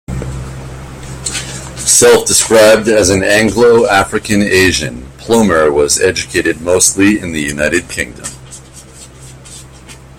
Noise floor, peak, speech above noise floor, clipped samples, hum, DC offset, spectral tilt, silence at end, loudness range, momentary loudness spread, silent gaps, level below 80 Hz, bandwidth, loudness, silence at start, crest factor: -35 dBFS; 0 dBFS; 24 dB; under 0.1%; none; under 0.1%; -3 dB/octave; 0.25 s; 6 LU; 20 LU; none; -34 dBFS; over 20 kHz; -10 LUFS; 0.1 s; 12 dB